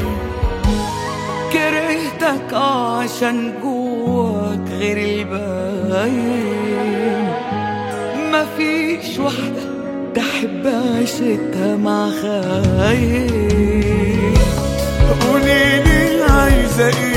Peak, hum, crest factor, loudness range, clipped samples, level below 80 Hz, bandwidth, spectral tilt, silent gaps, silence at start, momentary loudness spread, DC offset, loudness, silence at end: 0 dBFS; none; 16 dB; 5 LU; under 0.1%; -24 dBFS; 16.5 kHz; -5.5 dB/octave; none; 0 s; 9 LU; under 0.1%; -17 LUFS; 0 s